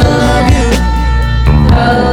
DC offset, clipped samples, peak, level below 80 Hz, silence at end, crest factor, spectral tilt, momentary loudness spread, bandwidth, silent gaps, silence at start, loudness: under 0.1%; under 0.1%; 0 dBFS; -12 dBFS; 0 s; 8 dB; -6.5 dB/octave; 4 LU; 13.5 kHz; none; 0 s; -10 LUFS